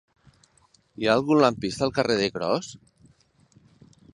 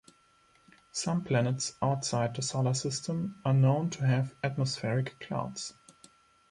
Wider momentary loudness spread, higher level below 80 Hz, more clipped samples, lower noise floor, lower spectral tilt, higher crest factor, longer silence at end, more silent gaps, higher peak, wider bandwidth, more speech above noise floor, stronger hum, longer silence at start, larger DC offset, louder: about the same, 8 LU vs 9 LU; first, -58 dBFS vs -66 dBFS; neither; about the same, -62 dBFS vs -65 dBFS; about the same, -5 dB/octave vs -5.5 dB/octave; first, 22 dB vs 16 dB; first, 1.4 s vs 0.8 s; neither; first, -4 dBFS vs -14 dBFS; about the same, 11.5 kHz vs 11.5 kHz; first, 39 dB vs 35 dB; neither; about the same, 1 s vs 0.95 s; neither; first, -24 LUFS vs -31 LUFS